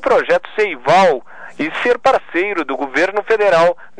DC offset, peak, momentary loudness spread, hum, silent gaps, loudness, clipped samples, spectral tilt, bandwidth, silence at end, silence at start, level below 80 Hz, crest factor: 2%; -4 dBFS; 8 LU; none; none; -15 LUFS; under 0.1%; -4.5 dB/octave; 10 kHz; 0.15 s; 0 s; -54 dBFS; 12 dB